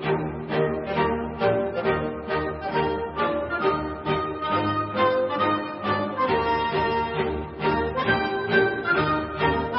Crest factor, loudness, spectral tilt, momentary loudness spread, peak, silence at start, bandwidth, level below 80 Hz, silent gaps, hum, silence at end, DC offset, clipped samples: 18 dB; -24 LUFS; -10.5 dB/octave; 5 LU; -8 dBFS; 0 s; 5.8 kHz; -44 dBFS; none; none; 0 s; under 0.1%; under 0.1%